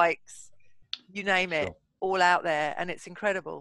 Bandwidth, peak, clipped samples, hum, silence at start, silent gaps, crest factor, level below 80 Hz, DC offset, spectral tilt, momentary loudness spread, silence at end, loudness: 12 kHz; -8 dBFS; under 0.1%; none; 0 s; none; 20 dB; -64 dBFS; under 0.1%; -3.5 dB/octave; 17 LU; 0 s; -28 LUFS